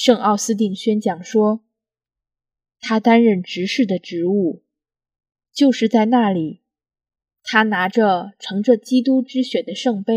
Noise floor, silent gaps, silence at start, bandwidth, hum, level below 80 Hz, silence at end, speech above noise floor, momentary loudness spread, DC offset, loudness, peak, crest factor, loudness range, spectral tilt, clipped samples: -88 dBFS; none; 0 s; 14 kHz; none; -72 dBFS; 0 s; 71 dB; 9 LU; under 0.1%; -18 LUFS; 0 dBFS; 18 dB; 2 LU; -5 dB/octave; under 0.1%